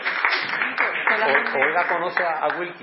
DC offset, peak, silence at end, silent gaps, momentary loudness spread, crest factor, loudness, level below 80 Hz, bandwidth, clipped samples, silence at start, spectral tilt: under 0.1%; -2 dBFS; 0 s; none; 5 LU; 20 dB; -21 LUFS; -86 dBFS; 5.8 kHz; under 0.1%; 0 s; -7 dB/octave